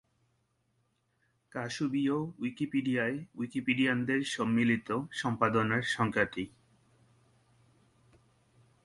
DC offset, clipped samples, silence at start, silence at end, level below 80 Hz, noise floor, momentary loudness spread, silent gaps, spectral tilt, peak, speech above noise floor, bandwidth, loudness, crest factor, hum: under 0.1%; under 0.1%; 1.55 s; 2.35 s; -68 dBFS; -76 dBFS; 10 LU; none; -5.5 dB/octave; -12 dBFS; 44 dB; 11.5 kHz; -31 LUFS; 22 dB; none